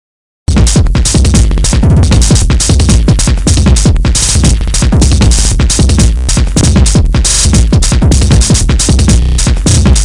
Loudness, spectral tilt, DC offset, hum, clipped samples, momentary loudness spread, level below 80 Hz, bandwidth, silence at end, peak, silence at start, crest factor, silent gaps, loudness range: -8 LUFS; -4.5 dB/octave; under 0.1%; none; 0.4%; 3 LU; -10 dBFS; 11.5 kHz; 0 s; 0 dBFS; 0.5 s; 6 dB; none; 0 LU